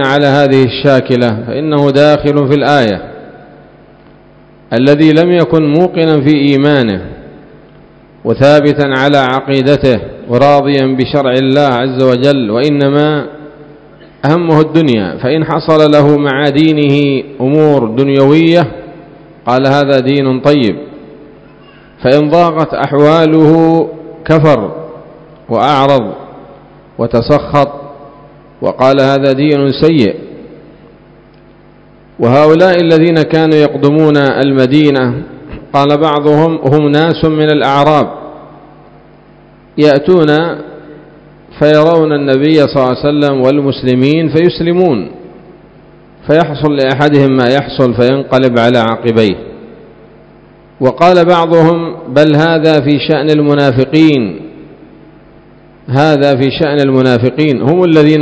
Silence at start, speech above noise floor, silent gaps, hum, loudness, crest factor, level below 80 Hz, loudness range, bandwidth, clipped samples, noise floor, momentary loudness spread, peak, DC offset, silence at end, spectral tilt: 0 s; 32 dB; none; none; -9 LUFS; 10 dB; -42 dBFS; 3 LU; 8 kHz; 2%; -40 dBFS; 9 LU; 0 dBFS; under 0.1%; 0 s; -7.5 dB/octave